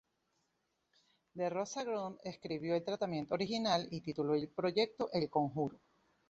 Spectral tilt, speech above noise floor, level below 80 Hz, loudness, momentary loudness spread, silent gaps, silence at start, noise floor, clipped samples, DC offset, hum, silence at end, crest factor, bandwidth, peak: -4.5 dB/octave; 45 dB; -74 dBFS; -37 LUFS; 8 LU; none; 1.35 s; -82 dBFS; under 0.1%; under 0.1%; none; 0.55 s; 20 dB; 7.6 kHz; -18 dBFS